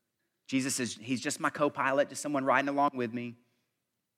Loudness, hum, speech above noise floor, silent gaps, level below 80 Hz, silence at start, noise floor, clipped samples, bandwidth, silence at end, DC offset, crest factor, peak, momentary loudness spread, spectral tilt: -31 LUFS; none; 53 dB; none; -86 dBFS; 0.5 s; -83 dBFS; under 0.1%; 15.5 kHz; 0.85 s; under 0.1%; 20 dB; -12 dBFS; 8 LU; -4 dB/octave